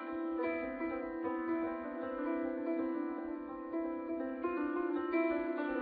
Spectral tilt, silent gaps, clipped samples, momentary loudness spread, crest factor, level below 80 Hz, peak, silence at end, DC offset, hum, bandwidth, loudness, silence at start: -4.5 dB/octave; none; under 0.1%; 6 LU; 16 dB; -68 dBFS; -22 dBFS; 0 s; under 0.1%; none; 4.7 kHz; -38 LUFS; 0 s